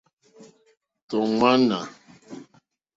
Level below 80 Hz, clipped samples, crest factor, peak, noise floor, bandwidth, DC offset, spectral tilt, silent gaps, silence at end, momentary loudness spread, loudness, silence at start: -64 dBFS; under 0.1%; 22 dB; -4 dBFS; -65 dBFS; 7.8 kHz; under 0.1%; -5.5 dB/octave; 1.02-1.08 s; 0.55 s; 25 LU; -22 LUFS; 0.4 s